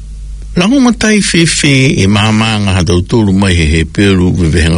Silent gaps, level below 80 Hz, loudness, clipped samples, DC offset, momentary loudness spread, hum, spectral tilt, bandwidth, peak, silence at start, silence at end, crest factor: none; -24 dBFS; -9 LUFS; 0.3%; under 0.1%; 3 LU; none; -5 dB/octave; 11 kHz; 0 dBFS; 0 s; 0 s; 8 dB